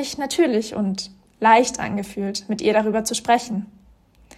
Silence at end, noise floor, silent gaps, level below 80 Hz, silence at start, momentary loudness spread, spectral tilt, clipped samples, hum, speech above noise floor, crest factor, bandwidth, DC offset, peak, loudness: 0.7 s; -53 dBFS; none; -56 dBFS; 0 s; 14 LU; -4 dB/octave; under 0.1%; none; 33 dB; 18 dB; 14.5 kHz; under 0.1%; -2 dBFS; -21 LUFS